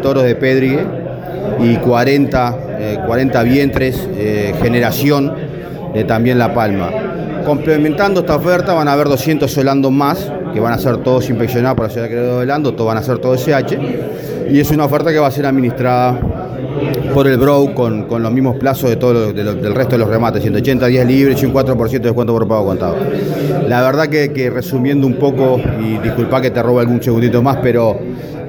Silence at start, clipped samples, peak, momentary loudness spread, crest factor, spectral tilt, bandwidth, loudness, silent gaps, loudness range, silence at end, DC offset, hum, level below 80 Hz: 0 s; under 0.1%; 0 dBFS; 7 LU; 12 dB; -7.5 dB/octave; over 20 kHz; -14 LUFS; none; 2 LU; 0 s; under 0.1%; none; -36 dBFS